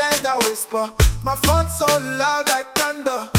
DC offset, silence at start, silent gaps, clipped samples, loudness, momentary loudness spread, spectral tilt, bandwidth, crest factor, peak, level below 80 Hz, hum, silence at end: under 0.1%; 0 s; none; under 0.1%; -19 LUFS; 4 LU; -3.5 dB/octave; 19 kHz; 18 dB; 0 dBFS; -28 dBFS; none; 0 s